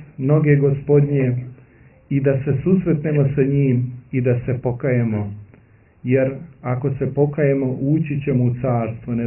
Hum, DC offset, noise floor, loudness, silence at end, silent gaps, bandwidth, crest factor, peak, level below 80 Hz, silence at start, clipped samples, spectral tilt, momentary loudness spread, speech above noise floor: none; under 0.1%; -50 dBFS; -19 LUFS; 0 s; none; 3 kHz; 16 dB; -2 dBFS; -48 dBFS; 0 s; under 0.1%; -14 dB/octave; 8 LU; 32 dB